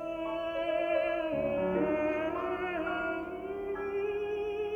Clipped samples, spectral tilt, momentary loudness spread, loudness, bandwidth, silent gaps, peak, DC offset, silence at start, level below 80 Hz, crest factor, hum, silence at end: under 0.1%; -7 dB/octave; 6 LU; -33 LUFS; 7.6 kHz; none; -18 dBFS; under 0.1%; 0 s; -58 dBFS; 14 dB; none; 0 s